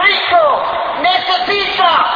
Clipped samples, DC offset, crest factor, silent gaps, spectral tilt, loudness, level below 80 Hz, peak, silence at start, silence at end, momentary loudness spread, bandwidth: under 0.1%; under 0.1%; 12 dB; none; -3.5 dB/octave; -12 LUFS; -48 dBFS; 0 dBFS; 0 s; 0 s; 5 LU; 5.2 kHz